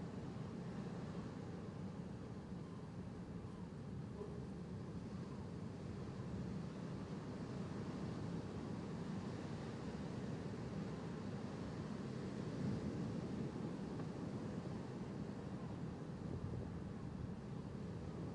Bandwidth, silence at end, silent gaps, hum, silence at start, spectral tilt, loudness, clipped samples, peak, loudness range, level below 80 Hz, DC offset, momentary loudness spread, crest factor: 11 kHz; 0 s; none; none; 0 s; -7.5 dB/octave; -48 LUFS; under 0.1%; -32 dBFS; 4 LU; -64 dBFS; under 0.1%; 4 LU; 14 dB